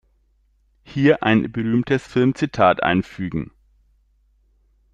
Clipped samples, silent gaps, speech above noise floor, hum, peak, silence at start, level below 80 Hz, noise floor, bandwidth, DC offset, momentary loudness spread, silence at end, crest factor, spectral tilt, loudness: under 0.1%; none; 43 dB; none; -2 dBFS; 0.9 s; -50 dBFS; -61 dBFS; 9.4 kHz; under 0.1%; 12 LU; 1.5 s; 20 dB; -7.5 dB/octave; -20 LUFS